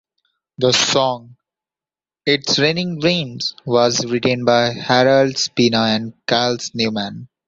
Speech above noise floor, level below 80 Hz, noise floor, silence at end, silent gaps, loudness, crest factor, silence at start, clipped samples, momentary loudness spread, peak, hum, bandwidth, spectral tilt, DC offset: over 73 dB; -56 dBFS; under -90 dBFS; 0.25 s; none; -17 LUFS; 18 dB; 0.6 s; under 0.1%; 8 LU; -2 dBFS; none; 8 kHz; -4 dB/octave; under 0.1%